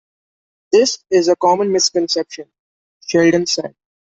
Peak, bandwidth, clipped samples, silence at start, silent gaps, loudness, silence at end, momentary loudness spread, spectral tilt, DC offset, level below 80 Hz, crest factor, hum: -2 dBFS; 8 kHz; under 0.1%; 0.7 s; 2.59-3.00 s; -15 LUFS; 0.4 s; 15 LU; -3.5 dB/octave; under 0.1%; -62 dBFS; 16 dB; none